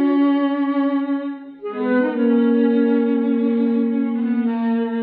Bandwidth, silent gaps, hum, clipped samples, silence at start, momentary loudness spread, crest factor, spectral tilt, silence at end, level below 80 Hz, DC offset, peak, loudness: 4.5 kHz; none; none; under 0.1%; 0 s; 8 LU; 12 dB; -10.5 dB/octave; 0 s; -76 dBFS; under 0.1%; -8 dBFS; -19 LUFS